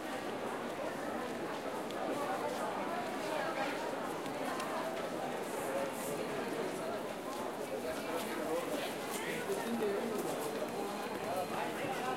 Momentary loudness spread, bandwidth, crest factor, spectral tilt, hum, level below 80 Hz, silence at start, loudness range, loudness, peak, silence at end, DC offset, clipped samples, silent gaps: 3 LU; 16 kHz; 16 dB; -4 dB/octave; none; -72 dBFS; 0 s; 1 LU; -38 LUFS; -24 dBFS; 0 s; under 0.1%; under 0.1%; none